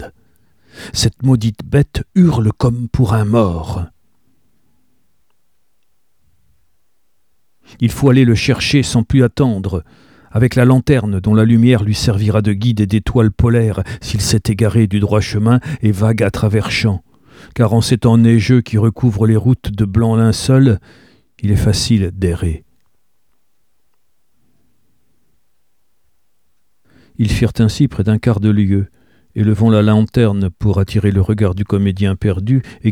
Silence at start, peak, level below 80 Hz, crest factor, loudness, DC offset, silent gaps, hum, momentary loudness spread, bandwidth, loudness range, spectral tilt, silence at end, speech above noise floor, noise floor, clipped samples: 0 s; 0 dBFS; -34 dBFS; 14 dB; -14 LUFS; 0.2%; none; none; 8 LU; 14.5 kHz; 7 LU; -6.5 dB/octave; 0 s; 56 dB; -69 dBFS; under 0.1%